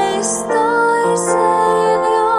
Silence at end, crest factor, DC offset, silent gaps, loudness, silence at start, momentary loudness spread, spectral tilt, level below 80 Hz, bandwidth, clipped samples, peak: 0 s; 12 dB; under 0.1%; none; -14 LUFS; 0 s; 3 LU; -3.5 dB/octave; -52 dBFS; 14 kHz; under 0.1%; -2 dBFS